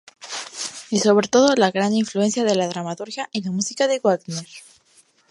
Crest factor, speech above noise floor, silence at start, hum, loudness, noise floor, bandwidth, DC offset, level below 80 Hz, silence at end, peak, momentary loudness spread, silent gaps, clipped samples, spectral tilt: 18 dB; 38 dB; 0.2 s; none; -20 LUFS; -57 dBFS; 11.5 kHz; under 0.1%; -68 dBFS; 0.7 s; -4 dBFS; 15 LU; none; under 0.1%; -4 dB/octave